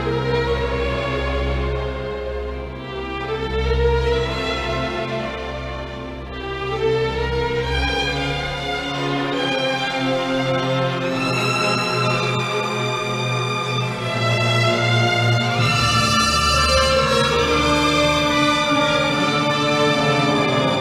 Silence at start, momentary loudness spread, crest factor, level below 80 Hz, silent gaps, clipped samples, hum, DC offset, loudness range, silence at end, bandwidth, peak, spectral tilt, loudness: 0 s; 11 LU; 16 dB; -32 dBFS; none; under 0.1%; none; under 0.1%; 7 LU; 0 s; 14.5 kHz; -4 dBFS; -4.5 dB/octave; -19 LUFS